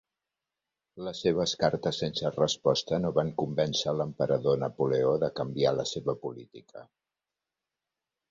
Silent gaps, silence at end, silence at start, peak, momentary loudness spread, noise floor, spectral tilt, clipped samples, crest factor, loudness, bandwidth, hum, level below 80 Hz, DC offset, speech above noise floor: none; 1.45 s; 0.95 s; -10 dBFS; 11 LU; -89 dBFS; -5 dB/octave; under 0.1%; 20 dB; -29 LUFS; 7.8 kHz; none; -62 dBFS; under 0.1%; 60 dB